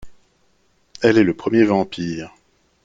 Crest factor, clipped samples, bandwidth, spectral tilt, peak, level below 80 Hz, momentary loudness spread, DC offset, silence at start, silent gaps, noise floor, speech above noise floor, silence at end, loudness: 20 dB; under 0.1%; 7.6 kHz; -6.5 dB/octave; -2 dBFS; -54 dBFS; 14 LU; under 0.1%; 0 s; none; -63 dBFS; 46 dB; 0.55 s; -18 LUFS